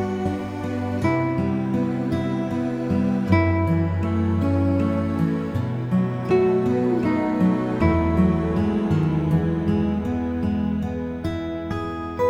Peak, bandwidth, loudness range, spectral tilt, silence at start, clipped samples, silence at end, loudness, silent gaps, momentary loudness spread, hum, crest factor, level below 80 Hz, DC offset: -4 dBFS; 11 kHz; 3 LU; -9 dB/octave; 0 s; under 0.1%; 0 s; -22 LUFS; none; 8 LU; none; 18 dB; -40 dBFS; under 0.1%